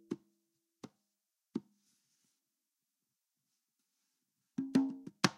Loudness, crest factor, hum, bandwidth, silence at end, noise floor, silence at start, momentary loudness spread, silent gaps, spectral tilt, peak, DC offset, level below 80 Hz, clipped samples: -38 LUFS; 32 dB; none; 15.5 kHz; 0 s; -88 dBFS; 0.1 s; 23 LU; none; -4.5 dB/octave; -12 dBFS; under 0.1%; -88 dBFS; under 0.1%